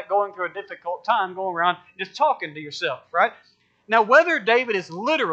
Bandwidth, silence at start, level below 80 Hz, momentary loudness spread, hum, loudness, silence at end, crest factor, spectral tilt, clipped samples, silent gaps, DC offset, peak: 8.2 kHz; 0 s; -82 dBFS; 14 LU; none; -22 LUFS; 0 s; 20 dB; -4 dB/octave; under 0.1%; none; under 0.1%; -2 dBFS